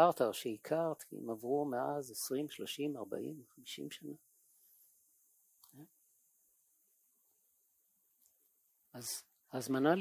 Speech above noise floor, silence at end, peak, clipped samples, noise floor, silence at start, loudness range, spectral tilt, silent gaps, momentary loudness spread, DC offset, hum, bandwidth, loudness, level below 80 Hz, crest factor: 39 dB; 0 s; -14 dBFS; under 0.1%; -76 dBFS; 0 s; 16 LU; -4.5 dB/octave; none; 17 LU; under 0.1%; none; 16 kHz; -39 LUFS; -88 dBFS; 26 dB